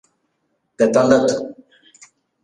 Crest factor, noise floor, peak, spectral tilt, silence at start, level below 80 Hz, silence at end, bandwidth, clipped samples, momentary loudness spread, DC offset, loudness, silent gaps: 18 dB; -70 dBFS; -2 dBFS; -5 dB/octave; 0.8 s; -58 dBFS; 0.9 s; 10.5 kHz; under 0.1%; 13 LU; under 0.1%; -16 LUFS; none